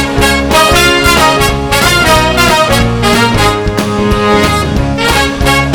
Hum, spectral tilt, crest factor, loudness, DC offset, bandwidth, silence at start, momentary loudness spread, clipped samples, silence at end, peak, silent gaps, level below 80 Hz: none; -4 dB/octave; 8 dB; -8 LUFS; under 0.1%; over 20 kHz; 0 s; 5 LU; 0.8%; 0 s; 0 dBFS; none; -20 dBFS